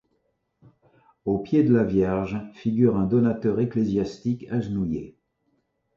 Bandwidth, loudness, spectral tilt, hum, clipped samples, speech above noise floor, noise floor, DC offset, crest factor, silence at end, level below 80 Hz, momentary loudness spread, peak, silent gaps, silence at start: 7.2 kHz; -24 LUFS; -9.5 dB/octave; none; under 0.1%; 50 dB; -72 dBFS; under 0.1%; 18 dB; 0.85 s; -50 dBFS; 10 LU; -6 dBFS; none; 1.25 s